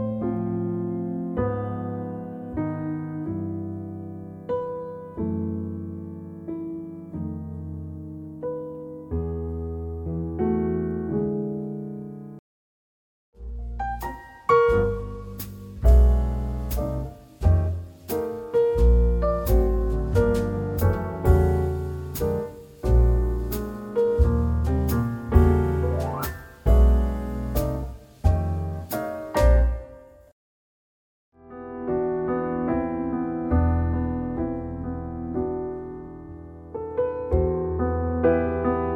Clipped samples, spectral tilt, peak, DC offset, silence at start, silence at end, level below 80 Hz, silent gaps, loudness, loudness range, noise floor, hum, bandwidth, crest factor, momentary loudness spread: under 0.1%; -8.5 dB/octave; -4 dBFS; under 0.1%; 0 s; 0 s; -28 dBFS; 12.39-13.33 s, 30.32-31.32 s; -25 LUFS; 9 LU; -46 dBFS; none; 17.5 kHz; 20 dB; 16 LU